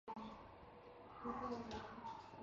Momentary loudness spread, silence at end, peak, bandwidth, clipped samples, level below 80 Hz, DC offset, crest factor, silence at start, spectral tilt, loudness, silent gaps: 13 LU; 0 s; -34 dBFS; 7.4 kHz; under 0.1%; -70 dBFS; under 0.1%; 18 dB; 0.05 s; -4.5 dB/octave; -51 LUFS; none